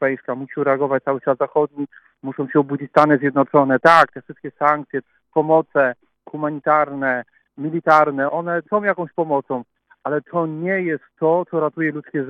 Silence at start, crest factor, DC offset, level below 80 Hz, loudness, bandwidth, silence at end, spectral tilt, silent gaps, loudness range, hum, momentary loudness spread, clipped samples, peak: 0 s; 20 dB; under 0.1%; -68 dBFS; -19 LUFS; 10.5 kHz; 0 s; -7.5 dB/octave; none; 5 LU; none; 14 LU; under 0.1%; 0 dBFS